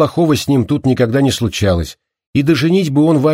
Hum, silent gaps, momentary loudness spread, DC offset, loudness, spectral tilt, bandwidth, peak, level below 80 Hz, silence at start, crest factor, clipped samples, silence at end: none; 2.27-2.33 s; 5 LU; under 0.1%; -14 LUFS; -6.5 dB/octave; 16 kHz; -2 dBFS; -38 dBFS; 0 s; 12 dB; under 0.1%; 0 s